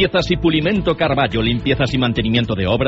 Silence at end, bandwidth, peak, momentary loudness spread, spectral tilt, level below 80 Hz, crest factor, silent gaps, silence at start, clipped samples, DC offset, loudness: 0 s; 8 kHz; -4 dBFS; 2 LU; -4.5 dB/octave; -32 dBFS; 14 dB; none; 0 s; under 0.1%; under 0.1%; -17 LUFS